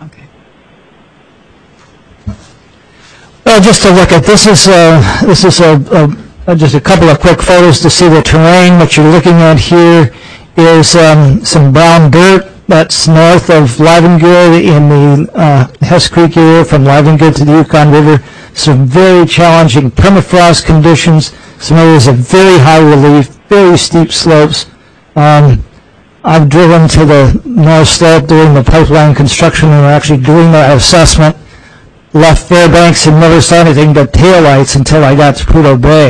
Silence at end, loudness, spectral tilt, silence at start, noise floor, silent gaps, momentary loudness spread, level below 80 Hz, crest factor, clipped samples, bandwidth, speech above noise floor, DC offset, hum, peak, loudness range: 0 s; -4 LUFS; -5.5 dB/octave; 0 s; -41 dBFS; none; 6 LU; -22 dBFS; 4 dB; 3%; 11 kHz; 37 dB; under 0.1%; none; 0 dBFS; 2 LU